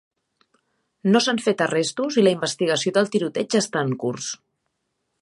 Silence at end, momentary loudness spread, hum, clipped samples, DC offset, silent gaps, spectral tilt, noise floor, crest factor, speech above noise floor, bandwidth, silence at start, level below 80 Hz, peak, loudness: 0.85 s; 8 LU; none; under 0.1%; under 0.1%; none; -4 dB/octave; -76 dBFS; 18 dB; 55 dB; 11.5 kHz; 1.05 s; -72 dBFS; -6 dBFS; -22 LUFS